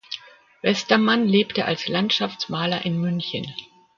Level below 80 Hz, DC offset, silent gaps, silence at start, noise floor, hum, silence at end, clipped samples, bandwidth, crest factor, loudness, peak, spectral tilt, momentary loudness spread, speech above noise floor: -64 dBFS; under 0.1%; none; 0.1 s; -41 dBFS; none; 0.3 s; under 0.1%; 7.4 kHz; 22 dB; -22 LUFS; -2 dBFS; -5.5 dB/octave; 15 LU; 20 dB